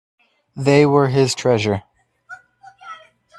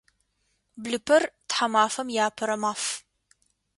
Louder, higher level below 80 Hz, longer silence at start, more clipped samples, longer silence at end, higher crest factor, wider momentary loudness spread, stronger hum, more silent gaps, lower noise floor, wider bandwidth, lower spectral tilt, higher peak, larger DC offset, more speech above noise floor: first, -17 LUFS vs -25 LUFS; first, -56 dBFS vs -70 dBFS; second, 0.55 s vs 0.75 s; neither; second, 0.45 s vs 0.8 s; about the same, 20 dB vs 20 dB; first, 24 LU vs 10 LU; neither; neither; second, -46 dBFS vs -73 dBFS; about the same, 12.5 kHz vs 11.5 kHz; first, -6 dB/octave vs -2 dB/octave; first, 0 dBFS vs -8 dBFS; neither; second, 31 dB vs 48 dB